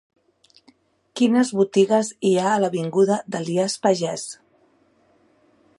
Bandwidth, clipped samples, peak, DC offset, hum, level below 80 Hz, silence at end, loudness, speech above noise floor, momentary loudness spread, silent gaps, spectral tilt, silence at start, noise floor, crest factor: 11.5 kHz; under 0.1%; -4 dBFS; under 0.1%; none; -72 dBFS; 1.45 s; -21 LUFS; 40 dB; 11 LU; none; -5 dB/octave; 1.15 s; -60 dBFS; 18 dB